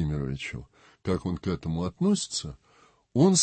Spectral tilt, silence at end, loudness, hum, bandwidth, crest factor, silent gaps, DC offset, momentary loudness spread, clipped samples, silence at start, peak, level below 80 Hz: -5 dB/octave; 0 s; -29 LUFS; none; 8.8 kHz; 18 dB; none; under 0.1%; 13 LU; under 0.1%; 0 s; -10 dBFS; -48 dBFS